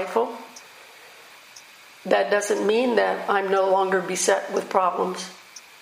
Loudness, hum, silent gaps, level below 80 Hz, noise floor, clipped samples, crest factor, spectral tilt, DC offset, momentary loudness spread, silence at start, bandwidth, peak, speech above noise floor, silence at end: -22 LUFS; none; none; -82 dBFS; -47 dBFS; under 0.1%; 20 dB; -3 dB/octave; under 0.1%; 22 LU; 0 s; 15.5 kHz; -4 dBFS; 25 dB; 0.2 s